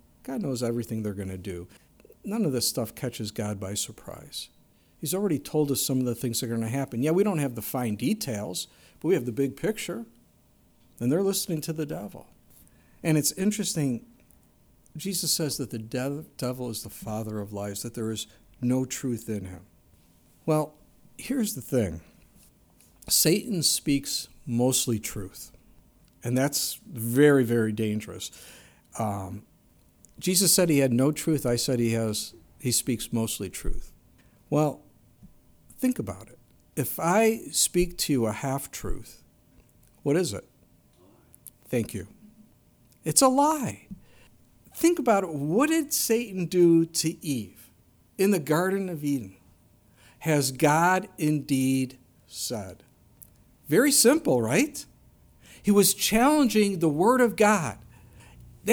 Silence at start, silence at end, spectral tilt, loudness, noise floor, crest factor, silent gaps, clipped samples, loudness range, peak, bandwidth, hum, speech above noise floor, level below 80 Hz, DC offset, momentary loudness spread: 0.25 s; 0 s; -4 dB/octave; -26 LUFS; -61 dBFS; 24 dB; none; under 0.1%; 8 LU; -4 dBFS; over 20 kHz; none; 35 dB; -50 dBFS; under 0.1%; 17 LU